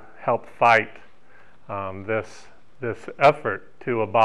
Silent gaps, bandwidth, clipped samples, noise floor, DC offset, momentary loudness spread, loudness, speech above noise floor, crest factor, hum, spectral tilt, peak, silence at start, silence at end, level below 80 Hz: none; 11 kHz; under 0.1%; -55 dBFS; 0.9%; 16 LU; -23 LUFS; 32 dB; 18 dB; none; -6 dB/octave; -6 dBFS; 0.2 s; 0 s; -62 dBFS